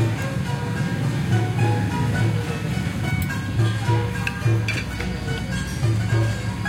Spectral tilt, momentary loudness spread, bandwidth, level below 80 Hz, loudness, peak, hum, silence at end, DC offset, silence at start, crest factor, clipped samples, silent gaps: -6 dB/octave; 5 LU; 16 kHz; -36 dBFS; -23 LUFS; -8 dBFS; none; 0 s; under 0.1%; 0 s; 14 dB; under 0.1%; none